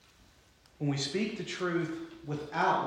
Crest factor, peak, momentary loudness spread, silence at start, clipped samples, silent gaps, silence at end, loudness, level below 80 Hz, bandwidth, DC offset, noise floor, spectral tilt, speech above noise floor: 18 dB; -16 dBFS; 9 LU; 0.8 s; under 0.1%; none; 0 s; -34 LUFS; -68 dBFS; 11 kHz; under 0.1%; -62 dBFS; -5 dB/octave; 30 dB